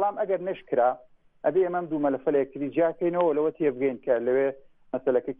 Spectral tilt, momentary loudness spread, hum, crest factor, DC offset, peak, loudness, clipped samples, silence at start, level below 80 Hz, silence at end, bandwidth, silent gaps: -10 dB/octave; 6 LU; none; 14 dB; under 0.1%; -12 dBFS; -26 LUFS; under 0.1%; 0 s; -66 dBFS; 0.05 s; 3.8 kHz; none